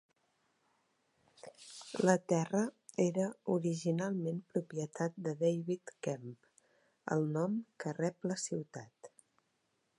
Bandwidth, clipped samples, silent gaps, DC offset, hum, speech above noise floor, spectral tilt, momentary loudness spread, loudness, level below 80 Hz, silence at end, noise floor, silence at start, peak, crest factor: 11.5 kHz; under 0.1%; none; under 0.1%; none; 44 dB; -6 dB/octave; 18 LU; -36 LUFS; -86 dBFS; 0.9 s; -80 dBFS; 1.45 s; -12 dBFS; 26 dB